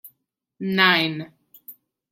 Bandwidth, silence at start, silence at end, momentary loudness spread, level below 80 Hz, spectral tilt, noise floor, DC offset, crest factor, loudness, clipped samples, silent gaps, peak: 16.5 kHz; 0.05 s; 0.4 s; 19 LU; -70 dBFS; -5.5 dB/octave; -73 dBFS; under 0.1%; 22 dB; -19 LUFS; under 0.1%; none; -2 dBFS